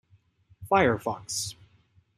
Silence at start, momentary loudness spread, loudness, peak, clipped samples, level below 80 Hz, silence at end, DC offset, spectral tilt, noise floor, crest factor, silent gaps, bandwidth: 0.6 s; 9 LU; -27 LUFS; -8 dBFS; under 0.1%; -60 dBFS; 0.65 s; under 0.1%; -4 dB/octave; -63 dBFS; 22 dB; none; 15 kHz